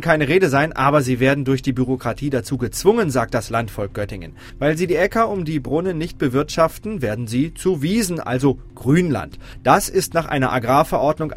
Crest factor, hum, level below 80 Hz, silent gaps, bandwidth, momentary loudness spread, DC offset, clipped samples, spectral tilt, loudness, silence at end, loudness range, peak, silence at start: 18 dB; none; -40 dBFS; none; 16 kHz; 8 LU; under 0.1%; under 0.1%; -6 dB/octave; -19 LUFS; 0 s; 3 LU; 0 dBFS; 0 s